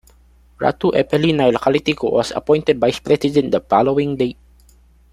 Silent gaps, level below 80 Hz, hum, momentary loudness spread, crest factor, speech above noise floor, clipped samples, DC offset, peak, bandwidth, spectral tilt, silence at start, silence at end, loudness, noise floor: none; -48 dBFS; none; 5 LU; 16 dB; 34 dB; under 0.1%; under 0.1%; -2 dBFS; 13 kHz; -6.5 dB/octave; 0.6 s; 0.8 s; -17 LUFS; -50 dBFS